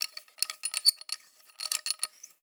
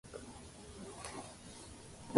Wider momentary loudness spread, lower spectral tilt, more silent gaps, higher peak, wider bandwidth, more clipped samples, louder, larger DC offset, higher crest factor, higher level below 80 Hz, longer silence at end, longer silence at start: first, 14 LU vs 6 LU; second, 6.5 dB/octave vs -4 dB/octave; neither; first, -6 dBFS vs -12 dBFS; first, over 20 kHz vs 11.5 kHz; neither; first, -30 LUFS vs -50 LUFS; neither; about the same, 28 dB vs 30 dB; second, under -90 dBFS vs -62 dBFS; first, 0.15 s vs 0 s; about the same, 0 s vs 0.05 s